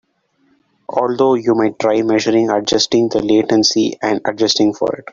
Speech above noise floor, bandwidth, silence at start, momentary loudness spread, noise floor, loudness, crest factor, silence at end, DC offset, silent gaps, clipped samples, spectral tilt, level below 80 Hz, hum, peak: 45 dB; 7.4 kHz; 0.9 s; 5 LU; -60 dBFS; -15 LUFS; 14 dB; 0.1 s; under 0.1%; none; under 0.1%; -4 dB/octave; -54 dBFS; none; -2 dBFS